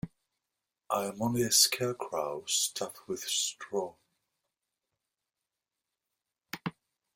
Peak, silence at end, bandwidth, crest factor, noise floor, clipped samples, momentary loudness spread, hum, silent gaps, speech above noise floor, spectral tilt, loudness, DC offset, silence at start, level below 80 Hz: -10 dBFS; 0.45 s; 16.5 kHz; 24 dB; -89 dBFS; under 0.1%; 17 LU; none; none; 57 dB; -2 dB/octave; -30 LUFS; under 0.1%; 0.05 s; -70 dBFS